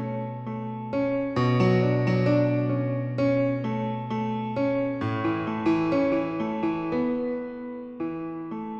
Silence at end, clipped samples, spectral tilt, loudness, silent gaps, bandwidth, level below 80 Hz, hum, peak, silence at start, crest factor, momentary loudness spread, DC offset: 0 s; under 0.1%; -9 dB/octave; -26 LUFS; none; 7 kHz; -58 dBFS; none; -10 dBFS; 0 s; 16 dB; 11 LU; under 0.1%